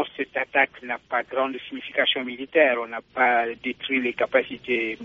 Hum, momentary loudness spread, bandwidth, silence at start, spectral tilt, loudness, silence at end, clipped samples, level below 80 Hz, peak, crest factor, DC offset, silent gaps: none; 8 LU; 7 kHz; 0 s; 0.5 dB/octave; -24 LUFS; 0 s; under 0.1%; -66 dBFS; -4 dBFS; 20 dB; under 0.1%; none